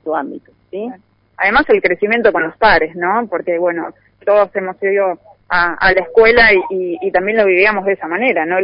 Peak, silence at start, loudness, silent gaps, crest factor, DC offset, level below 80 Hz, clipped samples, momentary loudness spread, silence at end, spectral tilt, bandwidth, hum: 0 dBFS; 0.05 s; -13 LUFS; none; 14 dB; under 0.1%; -42 dBFS; under 0.1%; 14 LU; 0 s; -9.5 dB/octave; 5.4 kHz; none